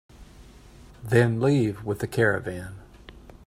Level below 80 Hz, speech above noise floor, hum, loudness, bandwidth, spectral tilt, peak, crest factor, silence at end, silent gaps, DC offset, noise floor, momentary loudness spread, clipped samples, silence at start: -50 dBFS; 25 dB; none; -24 LUFS; 15.5 kHz; -7 dB/octave; -6 dBFS; 20 dB; 0.15 s; none; under 0.1%; -49 dBFS; 20 LU; under 0.1%; 0.2 s